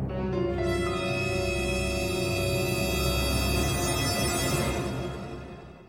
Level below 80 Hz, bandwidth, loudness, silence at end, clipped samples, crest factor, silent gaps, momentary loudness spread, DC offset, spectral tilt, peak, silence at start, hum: -36 dBFS; 16.5 kHz; -27 LUFS; 0 s; under 0.1%; 14 dB; none; 8 LU; under 0.1%; -4.5 dB/octave; -14 dBFS; 0 s; none